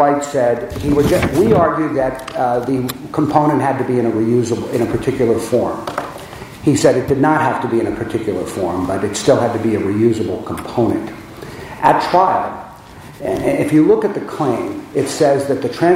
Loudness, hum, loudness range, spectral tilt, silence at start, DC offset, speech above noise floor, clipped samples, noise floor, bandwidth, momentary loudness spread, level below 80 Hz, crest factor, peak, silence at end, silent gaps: -16 LUFS; none; 2 LU; -6 dB/octave; 0 s; under 0.1%; 21 dB; under 0.1%; -36 dBFS; 16 kHz; 11 LU; -42 dBFS; 16 dB; 0 dBFS; 0 s; none